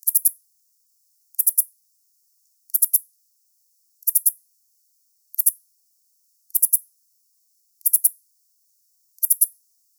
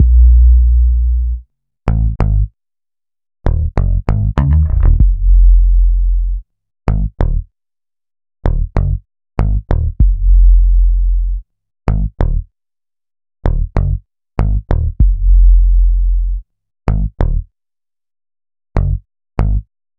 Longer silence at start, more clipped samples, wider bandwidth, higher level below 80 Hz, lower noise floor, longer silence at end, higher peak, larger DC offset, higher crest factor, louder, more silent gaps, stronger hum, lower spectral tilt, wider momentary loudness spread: about the same, 0.05 s vs 0 s; neither; first, over 20 kHz vs 2.6 kHz; second, under -90 dBFS vs -12 dBFS; second, -66 dBFS vs under -90 dBFS; first, 0.5 s vs 0.35 s; second, -4 dBFS vs 0 dBFS; neither; first, 22 dB vs 12 dB; second, -19 LUFS vs -16 LUFS; neither; neither; second, 10.5 dB/octave vs -10.5 dB/octave; second, 7 LU vs 12 LU